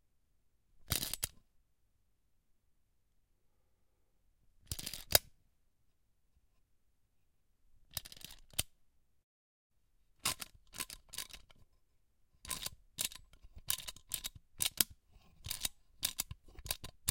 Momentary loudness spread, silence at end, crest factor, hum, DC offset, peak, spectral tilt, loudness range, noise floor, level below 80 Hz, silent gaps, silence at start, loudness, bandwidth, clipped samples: 17 LU; 0 s; 42 dB; none; under 0.1%; -4 dBFS; -1 dB/octave; 9 LU; -78 dBFS; -60 dBFS; 9.24-9.70 s; 0.75 s; -39 LUFS; 17 kHz; under 0.1%